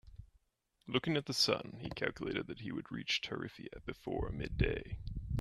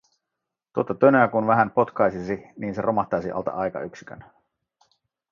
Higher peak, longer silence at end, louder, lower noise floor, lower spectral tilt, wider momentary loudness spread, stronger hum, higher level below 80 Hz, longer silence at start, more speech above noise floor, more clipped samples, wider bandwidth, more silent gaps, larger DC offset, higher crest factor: second, -16 dBFS vs -2 dBFS; second, 0 s vs 1.1 s; second, -38 LUFS vs -23 LUFS; second, -79 dBFS vs -84 dBFS; second, -4.5 dB/octave vs -8.5 dB/octave; about the same, 14 LU vs 15 LU; neither; first, -48 dBFS vs -60 dBFS; second, 0.05 s vs 0.75 s; second, 41 dB vs 62 dB; neither; first, 13 kHz vs 7.2 kHz; neither; neither; about the same, 22 dB vs 22 dB